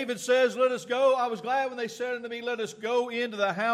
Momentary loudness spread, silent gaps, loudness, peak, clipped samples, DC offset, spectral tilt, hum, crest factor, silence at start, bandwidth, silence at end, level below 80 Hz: 9 LU; none; -27 LUFS; -12 dBFS; under 0.1%; under 0.1%; -3.5 dB/octave; none; 14 dB; 0 s; 14 kHz; 0 s; -82 dBFS